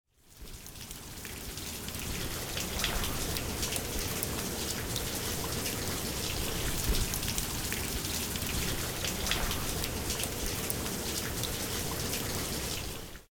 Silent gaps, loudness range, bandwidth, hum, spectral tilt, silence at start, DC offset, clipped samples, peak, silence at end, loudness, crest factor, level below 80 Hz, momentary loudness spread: none; 2 LU; over 20 kHz; none; -3 dB/octave; 0.25 s; under 0.1%; under 0.1%; -10 dBFS; 0.1 s; -33 LUFS; 26 dB; -42 dBFS; 9 LU